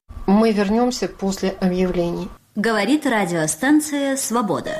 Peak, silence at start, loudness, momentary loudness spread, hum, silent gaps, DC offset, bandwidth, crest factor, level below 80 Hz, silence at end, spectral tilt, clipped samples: -8 dBFS; 0.1 s; -19 LUFS; 7 LU; none; none; under 0.1%; 15.5 kHz; 12 dB; -42 dBFS; 0 s; -5 dB/octave; under 0.1%